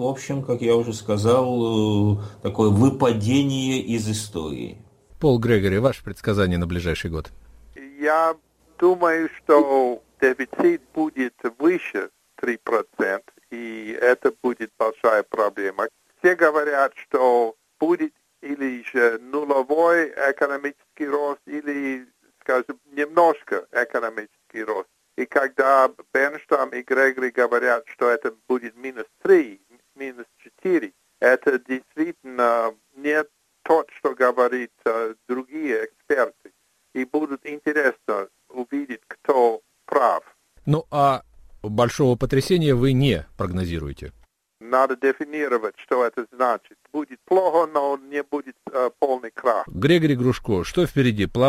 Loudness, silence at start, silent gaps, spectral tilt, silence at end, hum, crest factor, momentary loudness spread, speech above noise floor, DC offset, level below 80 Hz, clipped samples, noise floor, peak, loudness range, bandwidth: -22 LUFS; 0 s; none; -6.5 dB/octave; 0 s; none; 20 dB; 12 LU; 22 dB; under 0.1%; -48 dBFS; under 0.1%; -44 dBFS; -2 dBFS; 4 LU; 16 kHz